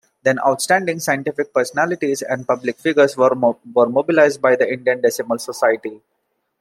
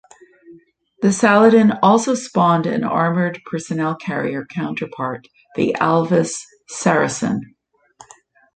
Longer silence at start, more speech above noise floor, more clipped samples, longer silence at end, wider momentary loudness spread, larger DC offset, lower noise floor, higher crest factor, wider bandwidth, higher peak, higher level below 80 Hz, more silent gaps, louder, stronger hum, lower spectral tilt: second, 0.25 s vs 0.5 s; first, 54 dB vs 33 dB; neither; second, 0.65 s vs 1.1 s; second, 7 LU vs 14 LU; neither; first, -71 dBFS vs -50 dBFS; about the same, 16 dB vs 16 dB; first, 16 kHz vs 9.4 kHz; about the same, -2 dBFS vs -2 dBFS; second, -68 dBFS vs -60 dBFS; neither; about the same, -18 LUFS vs -18 LUFS; neither; about the same, -4.5 dB/octave vs -5.5 dB/octave